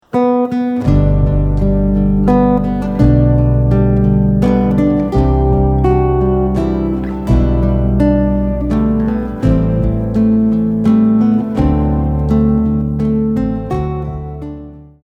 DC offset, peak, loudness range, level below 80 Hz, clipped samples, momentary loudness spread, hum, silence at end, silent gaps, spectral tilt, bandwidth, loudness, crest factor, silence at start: under 0.1%; -2 dBFS; 2 LU; -20 dBFS; under 0.1%; 6 LU; none; 0.2 s; none; -10.5 dB/octave; 6.6 kHz; -13 LUFS; 12 dB; 0.15 s